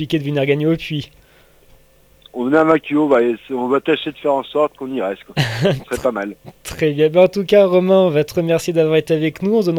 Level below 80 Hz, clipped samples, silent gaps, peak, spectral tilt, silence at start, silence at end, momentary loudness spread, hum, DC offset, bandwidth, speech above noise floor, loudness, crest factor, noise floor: -50 dBFS; under 0.1%; none; 0 dBFS; -6.5 dB/octave; 0 s; 0 s; 11 LU; none; under 0.1%; 17.5 kHz; 34 dB; -17 LUFS; 16 dB; -50 dBFS